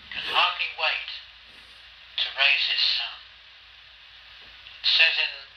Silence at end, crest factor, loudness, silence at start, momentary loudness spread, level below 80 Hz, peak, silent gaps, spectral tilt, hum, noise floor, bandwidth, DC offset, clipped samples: 0.1 s; 22 dB; -22 LUFS; 0 s; 20 LU; -64 dBFS; -4 dBFS; none; 0.5 dB/octave; none; -50 dBFS; 13.5 kHz; under 0.1%; under 0.1%